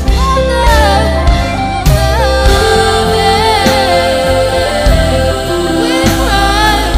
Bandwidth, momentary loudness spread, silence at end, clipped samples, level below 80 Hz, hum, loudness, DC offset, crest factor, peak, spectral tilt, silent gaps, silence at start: 16.5 kHz; 4 LU; 0 s; 0.3%; -14 dBFS; none; -10 LUFS; under 0.1%; 10 dB; 0 dBFS; -4.5 dB/octave; none; 0 s